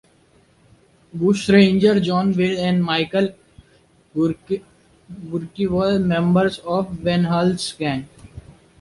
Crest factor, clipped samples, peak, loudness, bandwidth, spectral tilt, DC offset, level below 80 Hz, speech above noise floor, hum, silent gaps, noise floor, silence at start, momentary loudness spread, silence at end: 18 dB; under 0.1%; -2 dBFS; -19 LUFS; 11.5 kHz; -6.5 dB/octave; under 0.1%; -50 dBFS; 37 dB; none; none; -56 dBFS; 1.15 s; 14 LU; 0.4 s